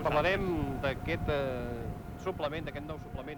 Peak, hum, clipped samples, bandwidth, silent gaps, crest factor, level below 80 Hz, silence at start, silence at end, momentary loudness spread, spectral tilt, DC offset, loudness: -16 dBFS; none; under 0.1%; over 20 kHz; none; 18 dB; -44 dBFS; 0 s; 0 s; 12 LU; -7 dB/octave; under 0.1%; -34 LUFS